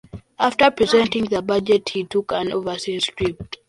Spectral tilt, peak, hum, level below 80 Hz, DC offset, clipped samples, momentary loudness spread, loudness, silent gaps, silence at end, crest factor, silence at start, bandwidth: -4.5 dB/octave; -2 dBFS; none; -50 dBFS; under 0.1%; under 0.1%; 8 LU; -20 LUFS; none; 0.15 s; 18 dB; 0.15 s; 11.5 kHz